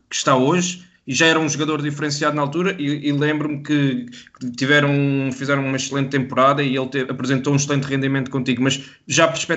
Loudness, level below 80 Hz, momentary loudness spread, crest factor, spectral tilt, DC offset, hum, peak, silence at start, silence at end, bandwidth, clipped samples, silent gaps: -19 LUFS; -62 dBFS; 8 LU; 18 dB; -4.5 dB/octave; under 0.1%; none; 0 dBFS; 0.1 s; 0 s; 8.2 kHz; under 0.1%; none